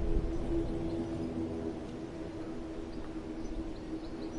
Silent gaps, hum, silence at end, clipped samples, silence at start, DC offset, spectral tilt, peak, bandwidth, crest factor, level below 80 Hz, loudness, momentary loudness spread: none; none; 0 s; under 0.1%; 0 s; under 0.1%; -7.5 dB/octave; -18 dBFS; 11 kHz; 18 dB; -40 dBFS; -39 LUFS; 7 LU